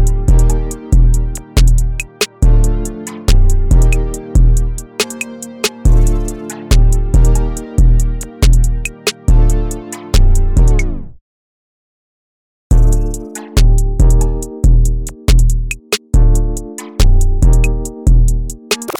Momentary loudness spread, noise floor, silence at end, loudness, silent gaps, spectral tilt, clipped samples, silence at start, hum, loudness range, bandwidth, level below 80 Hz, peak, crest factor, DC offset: 8 LU; under -90 dBFS; 0.05 s; -15 LUFS; 11.21-12.70 s; -5 dB/octave; under 0.1%; 0 s; none; 3 LU; 15 kHz; -12 dBFS; -2 dBFS; 8 dB; under 0.1%